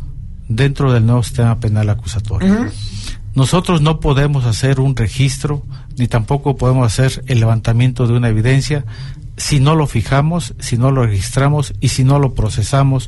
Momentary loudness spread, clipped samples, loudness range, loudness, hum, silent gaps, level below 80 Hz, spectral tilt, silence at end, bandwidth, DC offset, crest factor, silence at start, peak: 9 LU; under 0.1%; 1 LU; -15 LUFS; none; none; -28 dBFS; -6.5 dB/octave; 0 s; 12 kHz; under 0.1%; 12 dB; 0 s; -2 dBFS